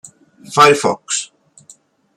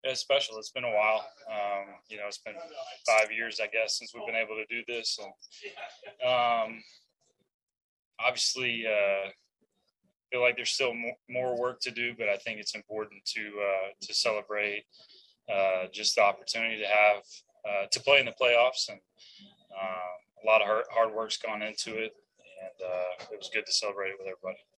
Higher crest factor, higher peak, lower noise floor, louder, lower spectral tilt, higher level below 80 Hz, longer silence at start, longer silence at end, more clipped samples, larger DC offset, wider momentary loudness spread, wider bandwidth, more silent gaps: about the same, 18 dB vs 22 dB; first, 0 dBFS vs -8 dBFS; second, -48 dBFS vs -76 dBFS; first, -14 LUFS vs -29 LUFS; first, -2.5 dB/octave vs -1 dB/octave; first, -64 dBFS vs -80 dBFS; first, 0.5 s vs 0.05 s; first, 0.9 s vs 0.25 s; neither; neither; second, 11 LU vs 16 LU; first, 16 kHz vs 12 kHz; second, none vs 7.54-7.59 s, 7.82-8.11 s